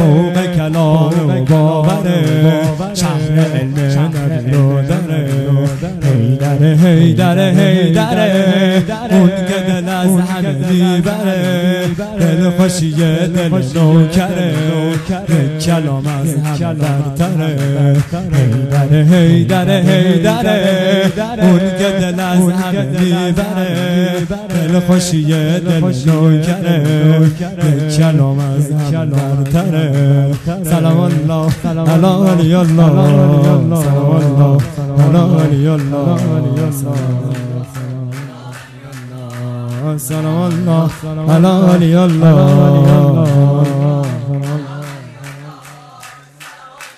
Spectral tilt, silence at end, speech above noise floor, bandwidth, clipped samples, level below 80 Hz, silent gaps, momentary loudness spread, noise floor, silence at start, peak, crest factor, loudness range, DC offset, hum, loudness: -7 dB/octave; 0.1 s; 25 dB; 14 kHz; 0.3%; -40 dBFS; none; 9 LU; -36 dBFS; 0 s; 0 dBFS; 12 dB; 5 LU; under 0.1%; none; -12 LUFS